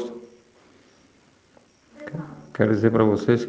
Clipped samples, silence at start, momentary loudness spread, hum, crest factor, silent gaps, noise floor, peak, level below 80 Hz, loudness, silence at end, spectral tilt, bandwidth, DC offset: under 0.1%; 0 s; 20 LU; none; 22 dB; none; -58 dBFS; -4 dBFS; -62 dBFS; -22 LUFS; 0 s; -8 dB/octave; 7.8 kHz; under 0.1%